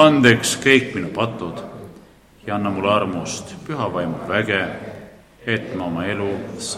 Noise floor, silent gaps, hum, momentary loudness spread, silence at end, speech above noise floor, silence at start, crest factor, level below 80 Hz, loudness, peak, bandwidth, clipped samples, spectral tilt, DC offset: -47 dBFS; none; none; 19 LU; 0 s; 27 dB; 0 s; 20 dB; -54 dBFS; -20 LUFS; 0 dBFS; 15 kHz; under 0.1%; -4.5 dB/octave; under 0.1%